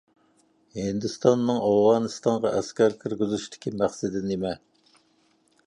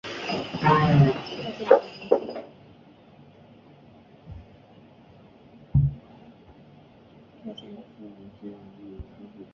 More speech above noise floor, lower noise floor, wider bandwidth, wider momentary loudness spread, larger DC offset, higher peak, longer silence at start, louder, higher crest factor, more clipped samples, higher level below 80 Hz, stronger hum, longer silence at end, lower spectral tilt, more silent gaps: first, 41 dB vs 30 dB; first, -65 dBFS vs -52 dBFS; first, 11 kHz vs 7 kHz; second, 12 LU vs 26 LU; neither; second, -6 dBFS vs -2 dBFS; first, 0.75 s vs 0.05 s; about the same, -25 LUFS vs -23 LUFS; second, 20 dB vs 26 dB; neither; second, -60 dBFS vs -46 dBFS; neither; first, 1.1 s vs 0.1 s; second, -6 dB/octave vs -8 dB/octave; neither